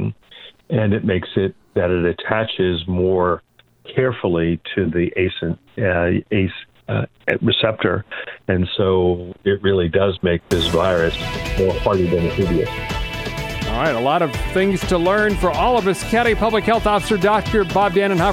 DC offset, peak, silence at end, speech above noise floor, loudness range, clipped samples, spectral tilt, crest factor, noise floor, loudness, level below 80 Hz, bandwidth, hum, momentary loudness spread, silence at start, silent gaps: under 0.1%; 0 dBFS; 0 s; 25 dB; 3 LU; under 0.1%; -6 dB/octave; 18 dB; -43 dBFS; -19 LUFS; -34 dBFS; 16 kHz; none; 8 LU; 0 s; none